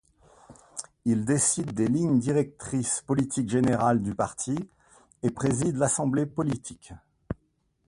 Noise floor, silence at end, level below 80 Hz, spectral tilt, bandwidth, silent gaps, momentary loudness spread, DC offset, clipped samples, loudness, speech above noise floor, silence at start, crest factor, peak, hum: -71 dBFS; 0.55 s; -54 dBFS; -5.5 dB/octave; 11.5 kHz; none; 17 LU; under 0.1%; under 0.1%; -26 LUFS; 45 dB; 0.5 s; 18 dB; -10 dBFS; none